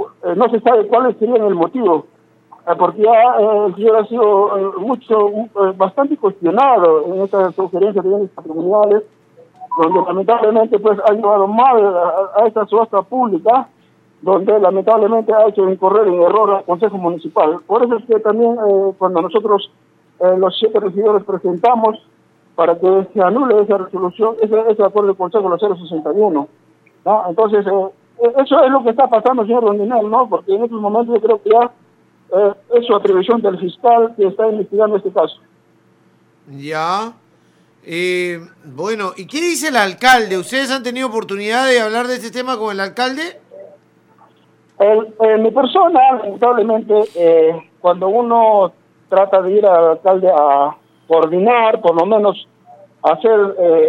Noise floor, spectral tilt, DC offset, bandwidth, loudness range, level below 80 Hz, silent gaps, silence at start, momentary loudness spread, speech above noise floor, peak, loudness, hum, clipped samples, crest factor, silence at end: -53 dBFS; -5 dB/octave; under 0.1%; 14 kHz; 5 LU; -68 dBFS; none; 0 s; 9 LU; 40 dB; 0 dBFS; -14 LUFS; none; under 0.1%; 14 dB; 0 s